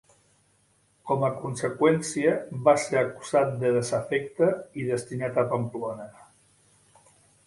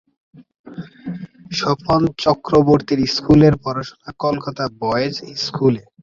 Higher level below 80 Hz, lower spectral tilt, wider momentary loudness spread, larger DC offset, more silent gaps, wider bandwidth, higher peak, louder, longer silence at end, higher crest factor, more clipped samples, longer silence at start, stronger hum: second, -66 dBFS vs -44 dBFS; about the same, -5.5 dB/octave vs -6.5 dB/octave; second, 9 LU vs 19 LU; neither; second, none vs 0.59-0.64 s; first, 11.5 kHz vs 7.6 kHz; second, -8 dBFS vs -2 dBFS; second, -26 LUFS vs -18 LUFS; first, 1.25 s vs 0.2 s; about the same, 20 dB vs 16 dB; neither; first, 1.05 s vs 0.35 s; first, 50 Hz at -60 dBFS vs none